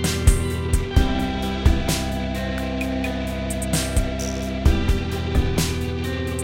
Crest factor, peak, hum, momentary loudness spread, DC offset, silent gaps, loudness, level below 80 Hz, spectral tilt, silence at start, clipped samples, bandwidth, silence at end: 20 dB; -2 dBFS; none; 6 LU; under 0.1%; none; -23 LUFS; -24 dBFS; -5 dB/octave; 0 s; under 0.1%; 16.5 kHz; 0 s